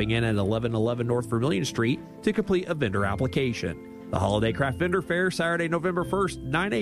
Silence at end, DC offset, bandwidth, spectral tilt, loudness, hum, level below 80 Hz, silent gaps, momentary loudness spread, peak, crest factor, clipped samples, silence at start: 0 s; under 0.1%; 14.5 kHz; -6 dB/octave; -26 LUFS; none; -48 dBFS; none; 4 LU; -10 dBFS; 16 dB; under 0.1%; 0 s